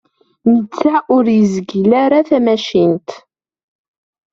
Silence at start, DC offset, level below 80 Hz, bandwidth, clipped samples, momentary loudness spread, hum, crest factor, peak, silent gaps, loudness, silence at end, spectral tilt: 0.45 s; under 0.1%; -56 dBFS; 7.4 kHz; under 0.1%; 5 LU; none; 12 dB; -2 dBFS; none; -13 LUFS; 1.15 s; -7 dB/octave